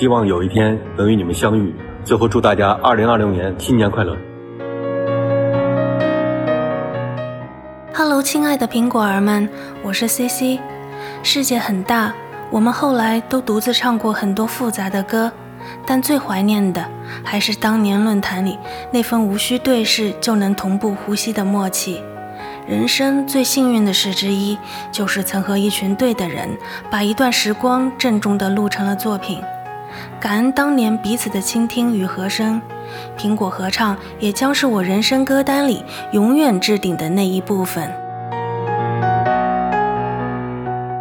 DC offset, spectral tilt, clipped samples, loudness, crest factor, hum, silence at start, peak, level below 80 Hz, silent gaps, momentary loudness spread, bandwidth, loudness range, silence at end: under 0.1%; -4.5 dB/octave; under 0.1%; -17 LUFS; 16 dB; none; 0 s; 0 dBFS; -48 dBFS; none; 11 LU; 20 kHz; 3 LU; 0 s